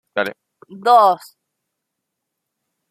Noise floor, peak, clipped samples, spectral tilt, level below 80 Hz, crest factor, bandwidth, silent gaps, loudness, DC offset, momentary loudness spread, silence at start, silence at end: -79 dBFS; -2 dBFS; under 0.1%; -4 dB/octave; -74 dBFS; 18 dB; 15 kHz; none; -16 LUFS; under 0.1%; 14 LU; 0.15 s; 1.75 s